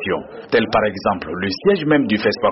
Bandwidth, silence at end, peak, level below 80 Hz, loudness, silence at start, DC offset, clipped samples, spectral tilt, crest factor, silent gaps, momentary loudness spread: 6 kHz; 0 s; -4 dBFS; -48 dBFS; -18 LUFS; 0 s; under 0.1%; under 0.1%; -4 dB/octave; 14 dB; none; 7 LU